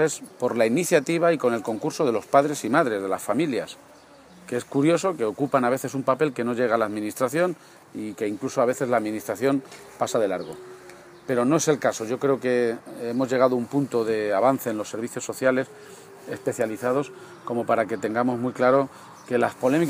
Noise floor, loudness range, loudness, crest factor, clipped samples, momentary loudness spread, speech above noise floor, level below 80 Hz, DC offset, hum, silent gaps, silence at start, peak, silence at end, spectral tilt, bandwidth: -50 dBFS; 3 LU; -24 LUFS; 20 dB; under 0.1%; 14 LU; 26 dB; -72 dBFS; under 0.1%; none; none; 0 s; -4 dBFS; 0 s; -5 dB/octave; 15.5 kHz